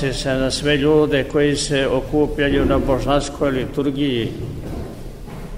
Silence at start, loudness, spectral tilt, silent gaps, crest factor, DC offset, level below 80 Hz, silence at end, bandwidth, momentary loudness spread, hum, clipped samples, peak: 0 s; -19 LUFS; -5.5 dB/octave; none; 16 dB; 0.6%; -32 dBFS; 0 s; 16 kHz; 14 LU; none; under 0.1%; -4 dBFS